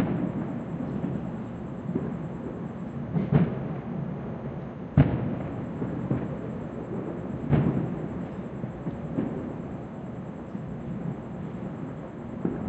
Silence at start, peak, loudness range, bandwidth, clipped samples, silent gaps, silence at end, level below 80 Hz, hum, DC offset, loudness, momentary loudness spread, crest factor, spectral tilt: 0 s; -6 dBFS; 6 LU; 7.8 kHz; under 0.1%; none; 0 s; -48 dBFS; none; under 0.1%; -31 LUFS; 12 LU; 24 dB; -10.5 dB/octave